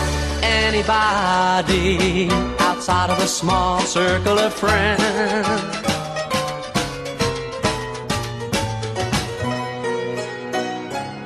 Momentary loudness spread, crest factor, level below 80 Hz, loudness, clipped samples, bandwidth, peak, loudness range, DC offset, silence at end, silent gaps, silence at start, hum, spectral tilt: 8 LU; 16 dB; -34 dBFS; -20 LUFS; under 0.1%; 13 kHz; -4 dBFS; 6 LU; under 0.1%; 0 s; none; 0 s; none; -4 dB/octave